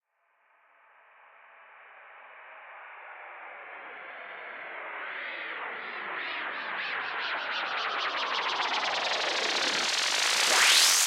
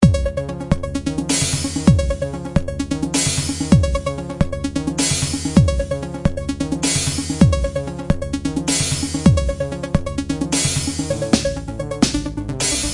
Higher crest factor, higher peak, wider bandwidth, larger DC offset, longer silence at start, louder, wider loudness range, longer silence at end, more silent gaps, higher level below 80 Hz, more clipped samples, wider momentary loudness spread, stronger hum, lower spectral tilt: about the same, 22 dB vs 18 dB; second, -8 dBFS vs 0 dBFS; first, 16 kHz vs 11.5 kHz; neither; first, 1.5 s vs 0 s; second, -27 LUFS vs -19 LUFS; first, 21 LU vs 1 LU; about the same, 0 s vs 0 s; neither; second, -86 dBFS vs -28 dBFS; neither; first, 22 LU vs 8 LU; neither; second, 2 dB/octave vs -4.5 dB/octave